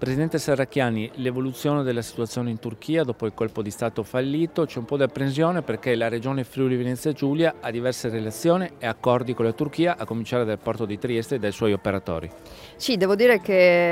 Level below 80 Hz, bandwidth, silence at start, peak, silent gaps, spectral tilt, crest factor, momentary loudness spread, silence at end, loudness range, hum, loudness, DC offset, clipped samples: -56 dBFS; 16 kHz; 0 s; -4 dBFS; none; -6 dB/octave; 20 dB; 8 LU; 0 s; 2 LU; none; -24 LUFS; under 0.1%; under 0.1%